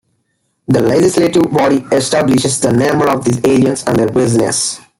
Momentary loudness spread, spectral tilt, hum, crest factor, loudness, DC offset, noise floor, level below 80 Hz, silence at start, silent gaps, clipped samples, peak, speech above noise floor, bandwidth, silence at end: 3 LU; -5 dB/octave; none; 12 dB; -12 LUFS; under 0.1%; -64 dBFS; -46 dBFS; 0.7 s; none; under 0.1%; 0 dBFS; 53 dB; 16.5 kHz; 0.2 s